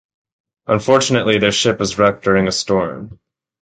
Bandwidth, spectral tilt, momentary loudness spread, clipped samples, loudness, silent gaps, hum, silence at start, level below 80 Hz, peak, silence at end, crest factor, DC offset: 9.4 kHz; -4 dB/octave; 8 LU; under 0.1%; -15 LUFS; none; none; 0.7 s; -46 dBFS; 0 dBFS; 0.5 s; 16 dB; under 0.1%